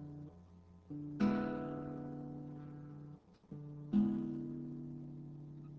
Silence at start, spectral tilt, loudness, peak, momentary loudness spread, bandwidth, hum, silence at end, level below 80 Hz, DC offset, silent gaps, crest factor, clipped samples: 0 s; -9.5 dB/octave; -41 LUFS; -22 dBFS; 20 LU; 6 kHz; none; 0 s; -66 dBFS; under 0.1%; none; 20 dB; under 0.1%